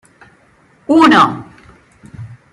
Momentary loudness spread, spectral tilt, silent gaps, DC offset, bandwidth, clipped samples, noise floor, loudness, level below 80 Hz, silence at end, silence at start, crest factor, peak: 26 LU; -5.5 dB/octave; none; under 0.1%; 11 kHz; under 0.1%; -50 dBFS; -10 LUFS; -52 dBFS; 0.2 s; 0.9 s; 14 dB; 0 dBFS